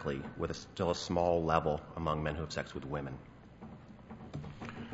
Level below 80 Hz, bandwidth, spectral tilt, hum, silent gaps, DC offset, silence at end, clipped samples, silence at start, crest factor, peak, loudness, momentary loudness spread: -52 dBFS; 7.6 kHz; -5 dB/octave; none; none; under 0.1%; 0 s; under 0.1%; 0 s; 24 dB; -12 dBFS; -36 LUFS; 21 LU